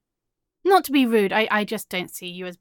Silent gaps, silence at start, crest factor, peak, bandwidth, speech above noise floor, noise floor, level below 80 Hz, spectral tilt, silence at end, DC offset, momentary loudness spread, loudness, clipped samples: none; 0.65 s; 18 dB; -6 dBFS; 17.5 kHz; 60 dB; -82 dBFS; -68 dBFS; -4.5 dB/octave; 0.05 s; under 0.1%; 14 LU; -21 LUFS; under 0.1%